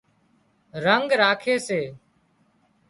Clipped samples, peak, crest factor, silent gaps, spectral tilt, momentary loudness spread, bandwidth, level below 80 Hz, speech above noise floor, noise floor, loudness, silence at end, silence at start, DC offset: under 0.1%; -4 dBFS; 22 dB; none; -4 dB/octave; 14 LU; 11.5 kHz; -68 dBFS; 42 dB; -64 dBFS; -22 LUFS; 0.95 s; 0.75 s; under 0.1%